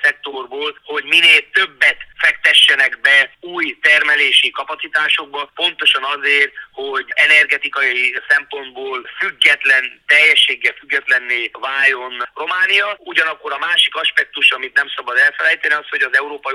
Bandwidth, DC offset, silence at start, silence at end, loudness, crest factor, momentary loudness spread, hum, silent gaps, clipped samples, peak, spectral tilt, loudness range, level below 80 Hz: over 20 kHz; under 0.1%; 0 s; 0 s; -13 LUFS; 16 dB; 14 LU; none; none; under 0.1%; 0 dBFS; 0.5 dB/octave; 3 LU; -62 dBFS